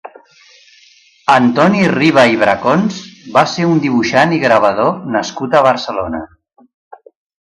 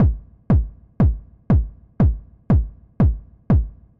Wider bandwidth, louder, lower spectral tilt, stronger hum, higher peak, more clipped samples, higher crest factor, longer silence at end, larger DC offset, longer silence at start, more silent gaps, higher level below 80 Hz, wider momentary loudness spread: first, 11 kHz vs 3.1 kHz; first, -12 LUFS vs -21 LUFS; second, -5.5 dB/octave vs -12 dB/octave; neither; first, 0 dBFS vs -8 dBFS; neither; about the same, 14 dB vs 12 dB; first, 1.2 s vs 0.3 s; neither; about the same, 0.05 s vs 0 s; neither; second, -50 dBFS vs -24 dBFS; second, 10 LU vs 14 LU